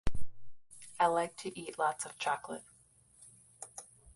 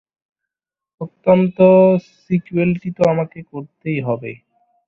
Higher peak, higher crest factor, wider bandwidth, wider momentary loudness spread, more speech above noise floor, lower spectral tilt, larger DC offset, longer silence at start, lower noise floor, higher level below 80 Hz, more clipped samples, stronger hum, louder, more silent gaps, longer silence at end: second, -16 dBFS vs -2 dBFS; about the same, 18 dB vs 16 dB; first, 11.5 kHz vs 6.8 kHz; first, 26 LU vs 21 LU; second, 30 dB vs 71 dB; second, -3.5 dB/octave vs -9.5 dB/octave; neither; second, 0.05 s vs 1 s; second, -65 dBFS vs -87 dBFS; about the same, -52 dBFS vs -56 dBFS; neither; neither; second, -35 LUFS vs -16 LUFS; neither; second, 0.35 s vs 0.55 s